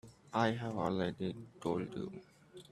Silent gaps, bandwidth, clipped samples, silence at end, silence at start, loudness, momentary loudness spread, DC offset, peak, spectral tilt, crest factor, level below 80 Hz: none; 12.5 kHz; under 0.1%; 0.1 s; 0.05 s; -38 LUFS; 18 LU; under 0.1%; -16 dBFS; -6.5 dB/octave; 22 dB; -70 dBFS